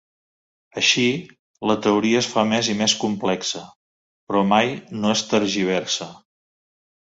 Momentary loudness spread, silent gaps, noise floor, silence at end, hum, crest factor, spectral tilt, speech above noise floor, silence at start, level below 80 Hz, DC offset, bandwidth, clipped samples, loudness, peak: 9 LU; 1.39-1.54 s, 3.76-4.27 s; under -90 dBFS; 0.95 s; none; 20 dB; -3.5 dB/octave; over 69 dB; 0.75 s; -60 dBFS; under 0.1%; 8 kHz; under 0.1%; -20 LUFS; -2 dBFS